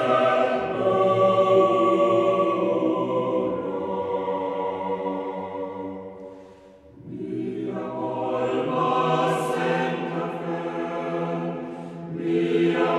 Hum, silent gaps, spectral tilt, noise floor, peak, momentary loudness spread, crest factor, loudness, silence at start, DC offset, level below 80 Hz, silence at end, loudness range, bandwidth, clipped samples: none; none; -7 dB/octave; -48 dBFS; -8 dBFS; 13 LU; 16 dB; -24 LUFS; 0 s; under 0.1%; -64 dBFS; 0 s; 10 LU; 12 kHz; under 0.1%